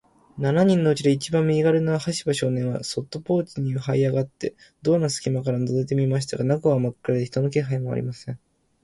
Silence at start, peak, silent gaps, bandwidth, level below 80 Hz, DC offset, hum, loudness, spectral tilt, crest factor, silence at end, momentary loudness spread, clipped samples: 0.35 s; -6 dBFS; none; 11.5 kHz; -58 dBFS; under 0.1%; none; -23 LUFS; -6.5 dB/octave; 16 dB; 0.45 s; 10 LU; under 0.1%